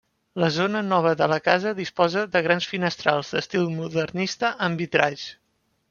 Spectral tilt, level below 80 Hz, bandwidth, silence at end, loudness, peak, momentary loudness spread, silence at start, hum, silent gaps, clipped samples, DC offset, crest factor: -5 dB/octave; -64 dBFS; 7.2 kHz; 0.6 s; -23 LUFS; -2 dBFS; 6 LU; 0.35 s; none; none; under 0.1%; under 0.1%; 22 dB